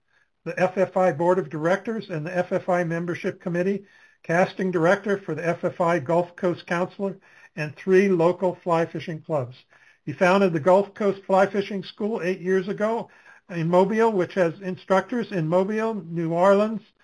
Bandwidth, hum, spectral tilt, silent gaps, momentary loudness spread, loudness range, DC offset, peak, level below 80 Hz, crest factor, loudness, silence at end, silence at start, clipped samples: 11 kHz; none; -7 dB/octave; none; 12 LU; 2 LU; under 0.1%; -6 dBFS; -68 dBFS; 18 dB; -23 LUFS; 0.25 s; 0.45 s; under 0.1%